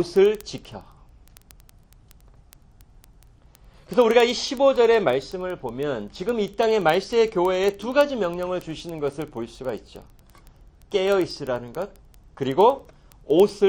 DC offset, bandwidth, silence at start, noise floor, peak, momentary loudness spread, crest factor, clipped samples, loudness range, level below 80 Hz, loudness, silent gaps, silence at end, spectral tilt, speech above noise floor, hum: under 0.1%; 17 kHz; 0 s; -52 dBFS; -4 dBFS; 15 LU; 20 dB; under 0.1%; 7 LU; -52 dBFS; -22 LUFS; none; 0 s; -5 dB/octave; 30 dB; none